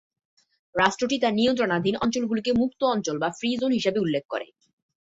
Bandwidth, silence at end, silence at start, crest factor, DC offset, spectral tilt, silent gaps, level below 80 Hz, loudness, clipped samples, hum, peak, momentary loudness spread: 8 kHz; 0.6 s; 0.75 s; 20 dB; under 0.1%; -4.5 dB/octave; 4.25-4.29 s; -58 dBFS; -25 LUFS; under 0.1%; none; -4 dBFS; 7 LU